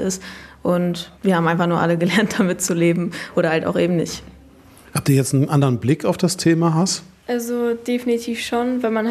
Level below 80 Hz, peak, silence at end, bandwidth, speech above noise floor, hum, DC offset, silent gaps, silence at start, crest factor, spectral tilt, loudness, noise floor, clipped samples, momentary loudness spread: -54 dBFS; -2 dBFS; 0 s; 14 kHz; 27 dB; none; under 0.1%; none; 0 s; 16 dB; -5.5 dB/octave; -19 LUFS; -46 dBFS; under 0.1%; 8 LU